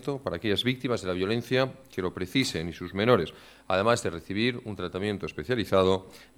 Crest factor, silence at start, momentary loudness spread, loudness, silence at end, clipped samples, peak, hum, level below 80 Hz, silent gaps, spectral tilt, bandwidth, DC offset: 20 dB; 0 s; 10 LU; -28 LUFS; 0.15 s; under 0.1%; -8 dBFS; none; -56 dBFS; none; -5.5 dB/octave; 16.5 kHz; under 0.1%